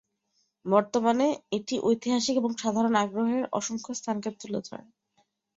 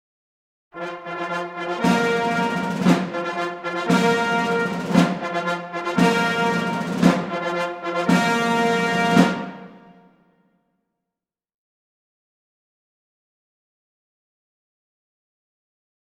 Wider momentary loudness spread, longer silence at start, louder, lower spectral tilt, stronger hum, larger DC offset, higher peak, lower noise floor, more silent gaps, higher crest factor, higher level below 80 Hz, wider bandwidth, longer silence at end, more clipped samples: about the same, 11 LU vs 9 LU; about the same, 0.65 s vs 0.75 s; second, -27 LUFS vs -21 LUFS; about the same, -4.5 dB/octave vs -5.5 dB/octave; neither; neither; second, -8 dBFS vs -2 dBFS; second, -74 dBFS vs -87 dBFS; neither; about the same, 20 dB vs 22 dB; second, -70 dBFS vs -60 dBFS; second, 7.8 kHz vs 15 kHz; second, 0.75 s vs 6.4 s; neither